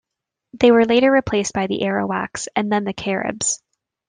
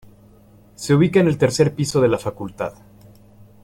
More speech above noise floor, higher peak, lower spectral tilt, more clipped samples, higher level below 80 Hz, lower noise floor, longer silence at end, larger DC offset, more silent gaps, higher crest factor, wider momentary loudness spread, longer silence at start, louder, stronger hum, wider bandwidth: first, 65 dB vs 31 dB; about the same, -2 dBFS vs -4 dBFS; second, -4 dB/octave vs -6 dB/octave; neither; about the same, -52 dBFS vs -50 dBFS; first, -83 dBFS vs -49 dBFS; second, 0.5 s vs 0.95 s; neither; neither; about the same, 18 dB vs 18 dB; second, 9 LU vs 14 LU; second, 0.55 s vs 0.8 s; about the same, -19 LUFS vs -19 LUFS; neither; second, 10 kHz vs 16 kHz